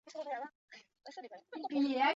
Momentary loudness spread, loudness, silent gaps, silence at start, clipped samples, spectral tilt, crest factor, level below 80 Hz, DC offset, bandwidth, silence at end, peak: 22 LU; -38 LUFS; 0.55-0.68 s; 0.05 s; under 0.1%; 0 dB/octave; 18 dB; -86 dBFS; under 0.1%; 7.8 kHz; 0 s; -20 dBFS